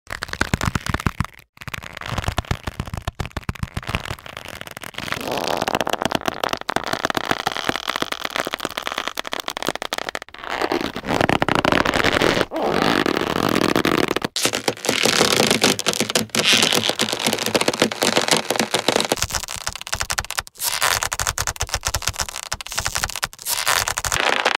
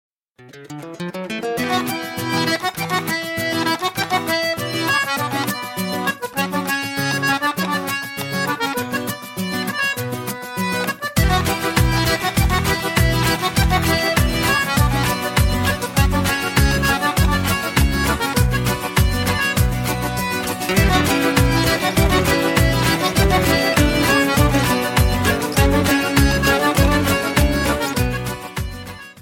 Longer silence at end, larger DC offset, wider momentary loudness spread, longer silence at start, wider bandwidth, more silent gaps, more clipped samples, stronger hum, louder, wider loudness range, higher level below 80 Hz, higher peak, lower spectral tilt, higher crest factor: about the same, 0.05 s vs 0 s; neither; first, 12 LU vs 8 LU; second, 0.1 s vs 0.4 s; about the same, 17 kHz vs 17 kHz; first, 1.49-1.53 s vs none; neither; neither; second, -21 LUFS vs -18 LUFS; first, 10 LU vs 5 LU; second, -40 dBFS vs -26 dBFS; about the same, 0 dBFS vs -2 dBFS; second, -2.5 dB/octave vs -4.5 dB/octave; first, 22 dB vs 16 dB